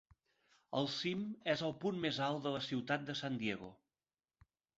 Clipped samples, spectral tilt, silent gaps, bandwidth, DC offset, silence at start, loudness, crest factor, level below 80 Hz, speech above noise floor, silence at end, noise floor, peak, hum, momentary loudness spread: under 0.1%; -3.5 dB/octave; none; 7.6 kHz; under 0.1%; 0.7 s; -39 LUFS; 22 dB; -76 dBFS; over 51 dB; 1.05 s; under -90 dBFS; -20 dBFS; none; 4 LU